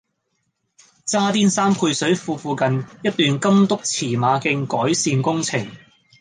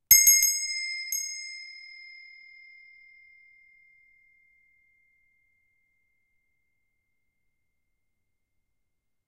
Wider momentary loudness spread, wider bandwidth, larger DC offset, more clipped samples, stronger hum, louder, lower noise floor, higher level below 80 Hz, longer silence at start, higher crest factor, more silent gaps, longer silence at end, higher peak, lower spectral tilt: second, 7 LU vs 30 LU; second, 10 kHz vs 15 kHz; neither; neither; neither; about the same, -19 LUFS vs -21 LUFS; second, -72 dBFS vs -81 dBFS; about the same, -62 dBFS vs -66 dBFS; first, 1.05 s vs 0.1 s; second, 16 dB vs 28 dB; neither; second, 0.45 s vs 7.55 s; about the same, -4 dBFS vs -2 dBFS; first, -4.5 dB/octave vs 4.5 dB/octave